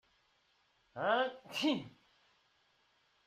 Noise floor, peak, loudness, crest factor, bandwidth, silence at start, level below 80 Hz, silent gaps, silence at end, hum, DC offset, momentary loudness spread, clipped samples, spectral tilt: -74 dBFS; -20 dBFS; -36 LUFS; 20 dB; 13.5 kHz; 0.95 s; -82 dBFS; none; 1.35 s; none; under 0.1%; 17 LU; under 0.1%; -4 dB/octave